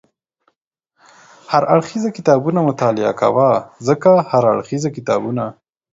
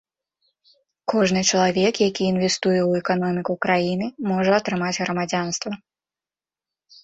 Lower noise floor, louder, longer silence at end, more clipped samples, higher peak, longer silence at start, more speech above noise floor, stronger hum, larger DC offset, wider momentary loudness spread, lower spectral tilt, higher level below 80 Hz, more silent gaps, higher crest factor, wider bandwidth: second, -72 dBFS vs under -90 dBFS; first, -16 LUFS vs -21 LUFS; second, 0.4 s vs 1.3 s; neither; first, 0 dBFS vs -4 dBFS; first, 1.5 s vs 1.05 s; second, 57 dB vs over 69 dB; neither; neither; about the same, 9 LU vs 7 LU; first, -7 dB/octave vs -4.5 dB/octave; about the same, -60 dBFS vs -60 dBFS; neither; about the same, 16 dB vs 18 dB; about the same, 7.8 kHz vs 8.2 kHz